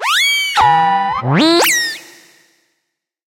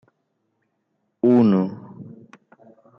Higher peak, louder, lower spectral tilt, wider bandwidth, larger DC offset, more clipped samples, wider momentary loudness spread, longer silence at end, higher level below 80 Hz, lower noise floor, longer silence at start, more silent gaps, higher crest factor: first, -2 dBFS vs -8 dBFS; first, -12 LUFS vs -19 LUFS; second, -3 dB/octave vs -10.5 dB/octave; first, 16.5 kHz vs 5.8 kHz; neither; neither; second, 6 LU vs 25 LU; first, 1.3 s vs 0.95 s; first, -54 dBFS vs -68 dBFS; about the same, -74 dBFS vs -73 dBFS; second, 0 s vs 1.25 s; neither; about the same, 14 dB vs 16 dB